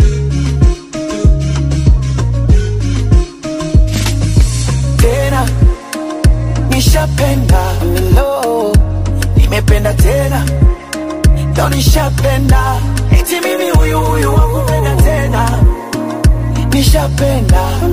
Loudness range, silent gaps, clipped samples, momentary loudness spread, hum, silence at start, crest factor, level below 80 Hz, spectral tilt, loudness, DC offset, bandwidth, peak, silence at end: 1 LU; none; under 0.1%; 4 LU; none; 0 s; 10 dB; -14 dBFS; -6 dB/octave; -12 LUFS; 0.8%; 16 kHz; 0 dBFS; 0 s